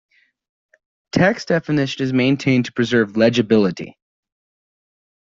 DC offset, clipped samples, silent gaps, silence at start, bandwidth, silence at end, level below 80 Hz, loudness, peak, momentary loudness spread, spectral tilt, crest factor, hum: under 0.1%; under 0.1%; none; 1.15 s; 7.8 kHz; 1.4 s; -56 dBFS; -18 LUFS; -2 dBFS; 6 LU; -6.5 dB/octave; 18 dB; none